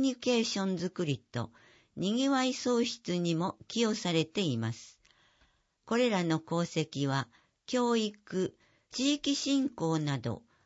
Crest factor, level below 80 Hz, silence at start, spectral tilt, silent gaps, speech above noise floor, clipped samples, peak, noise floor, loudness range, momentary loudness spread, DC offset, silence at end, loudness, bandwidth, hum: 18 dB; -72 dBFS; 0 s; -5 dB/octave; none; 39 dB; under 0.1%; -14 dBFS; -70 dBFS; 2 LU; 9 LU; under 0.1%; 0.25 s; -32 LUFS; 8 kHz; none